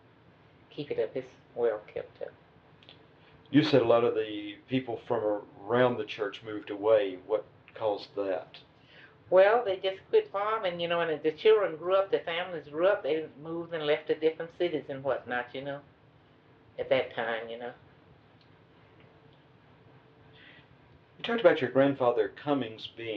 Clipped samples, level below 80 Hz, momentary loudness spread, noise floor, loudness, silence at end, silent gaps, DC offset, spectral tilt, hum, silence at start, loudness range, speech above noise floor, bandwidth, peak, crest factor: under 0.1%; -74 dBFS; 16 LU; -60 dBFS; -29 LUFS; 0 s; none; under 0.1%; -7 dB/octave; none; 0.75 s; 8 LU; 31 dB; 6.6 kHz; -8 dBFS; 22 dB